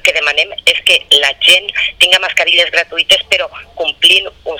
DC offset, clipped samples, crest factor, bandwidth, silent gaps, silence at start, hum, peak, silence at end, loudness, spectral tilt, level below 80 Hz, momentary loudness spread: under 0.1%; 0.8%; 12 dB; over 20 kHz; none; 0.05 s; none; 0 dBFS; 0 s; -9 LUFS; 1 dB/octave; -46 dBFS; 7 LU